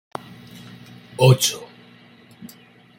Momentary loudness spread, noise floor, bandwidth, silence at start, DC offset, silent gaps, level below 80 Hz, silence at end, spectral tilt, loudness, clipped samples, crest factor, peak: 28 LU; -49 dBFS; 17 kHz; 1.2 s; under 0.1%; none; -60 dBFS; 1.35 s; -4.5 dB/octave; -17 LUFS; under 0.1%; 22 dB; -2 dBFS